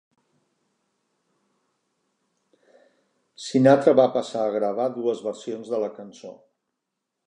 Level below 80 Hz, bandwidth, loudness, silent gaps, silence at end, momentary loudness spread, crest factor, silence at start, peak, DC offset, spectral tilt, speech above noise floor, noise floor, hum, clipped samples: -80 dBFS; 10 kHz; -22 LUFS; none; 0.95 s; 24 LU; 22 dB; 3.4 s; -2 dBFS; under 0.1%; -6.5 dB/octave; 60 dB; -82 dBFS; none; under 0.1%